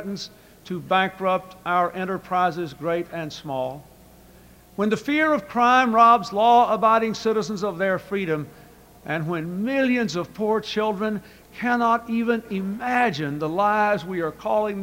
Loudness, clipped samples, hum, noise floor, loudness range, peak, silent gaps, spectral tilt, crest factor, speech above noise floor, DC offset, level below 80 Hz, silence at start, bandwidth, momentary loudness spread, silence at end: -22 LUFS; under 0.1%; none; -50 dBFS; 7 LU; -4 dBFS; none; -5.5 dB/octave; 18 dB; 27 dB; under 0.1%; -58 dBFS; 0 s; 16 kHz; 13 LU; 0 s